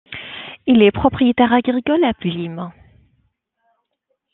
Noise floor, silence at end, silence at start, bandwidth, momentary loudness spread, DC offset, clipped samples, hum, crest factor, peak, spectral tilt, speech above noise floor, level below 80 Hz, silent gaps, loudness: -72 dBFS; 1.65 s; 0.1 s; 4.1 kHz; 18 LU; under 0.1%; under 0.1%; none; 18 dB; -2 dBFS; -9.5 dB/octave; 57 dB; -48 dBFS; none; -16 LUFS